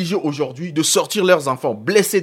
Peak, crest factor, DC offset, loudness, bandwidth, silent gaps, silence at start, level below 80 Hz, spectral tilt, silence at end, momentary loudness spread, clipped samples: -2 dBFS; 16 dB; under 0.1%; -18 LUFS; 16.5 kHz; none; 0 s; -68 dBFS; -3.5 dB/octave; 0 s; 7 LU; under 0.1%